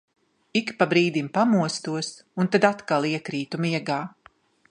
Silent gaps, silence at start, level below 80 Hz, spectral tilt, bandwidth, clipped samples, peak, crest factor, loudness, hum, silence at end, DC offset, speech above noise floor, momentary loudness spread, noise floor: none; 0.55 s; -72 dBFS; -5.5 dB/octave; 10.5 kHz; under 0.1%; -2 dBFS; 22 dB; -24 LUFS; none; 0.6 s; under 0.1%; 34 dB; 10 LU; -57 dBFS